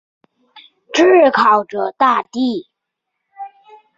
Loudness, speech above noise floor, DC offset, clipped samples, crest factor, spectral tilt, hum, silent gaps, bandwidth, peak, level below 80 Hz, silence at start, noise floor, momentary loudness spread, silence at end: -14 LUFS; 64 dB; under 0.1%; under 0.1%; 16 dB; -4 dB/octave; none; none; 7.6 kHz; -2 dBFS; -64 dBFS; 0.95 s; -77 dBFS; 25 LU; 0.5 s